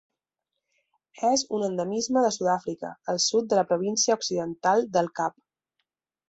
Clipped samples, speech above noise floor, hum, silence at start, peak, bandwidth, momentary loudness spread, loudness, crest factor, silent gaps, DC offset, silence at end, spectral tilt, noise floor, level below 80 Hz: under 0.1%; 60 dB; none; 1.15 s; -10 dBFS; 8.2 kHz; 7 LU; -25 LUFS; 18 dB; none; under 0.1%; 1 s; -3 dB/octave; -85 dBFS; -70 dBFS